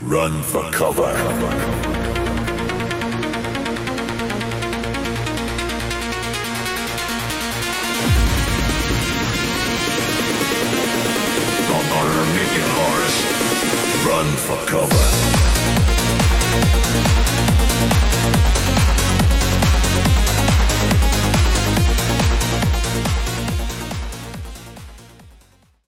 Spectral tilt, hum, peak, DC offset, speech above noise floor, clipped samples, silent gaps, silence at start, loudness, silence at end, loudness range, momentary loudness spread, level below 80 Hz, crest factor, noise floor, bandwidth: -4 dB/octave; none; -4 dBFS; under 0.1%; 36 dB; under 0.1%; none; 0 s; -18 LUFS; 0.6 s; 7 LU; 7 LU; -24 dBFS; 14 dB; -52 dBFS; 16.5 kHz